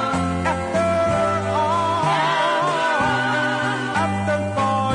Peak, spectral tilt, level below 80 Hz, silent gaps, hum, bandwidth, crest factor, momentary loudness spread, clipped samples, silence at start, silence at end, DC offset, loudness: -8 dBFS; -5 dB/octave; -50 dBFS; none; none; 11 kHz; 12 dB; 3 LU; under 0.1%; 0 s; 0 s; under 0.1%; -20 LUFS